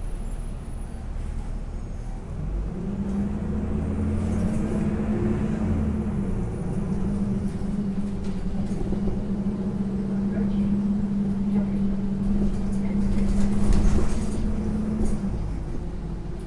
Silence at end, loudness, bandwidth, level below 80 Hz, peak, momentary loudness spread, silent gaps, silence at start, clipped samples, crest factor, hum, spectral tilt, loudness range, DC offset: 0 s; -27 LUFS; 11 kHz; -30 dBFS; -8 dBFS; 11 LU; none; 0 s; under 0.1%; 16 dB; none; -8.5 dB/octave; 4 LU; under 0.1%